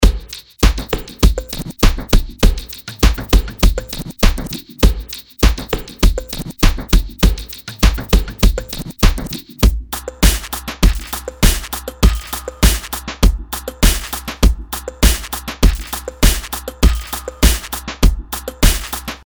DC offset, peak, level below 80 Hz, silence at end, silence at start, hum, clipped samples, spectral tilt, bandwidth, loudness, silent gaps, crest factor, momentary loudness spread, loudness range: under 0.1%; 0 dBFS; -16 dBFS; 0.1 s; 0 s; none; under 0.1%; -4 dB/octave; over 20 kHz; -18 LUFS; none; 14 dB; 10 LU; 1 LU